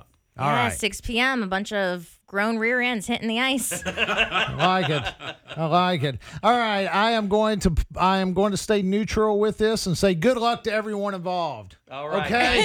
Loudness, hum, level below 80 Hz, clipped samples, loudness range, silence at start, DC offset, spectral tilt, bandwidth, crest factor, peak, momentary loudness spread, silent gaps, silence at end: -23 LUFS; none; -40 dBFS; under 0.1%; 2 LU; 0.35 s; under 0.1%; -4.5 dB/octave; 18.5 kHz; 18 dB; -6 dBFS; 7 LU; none; 0 s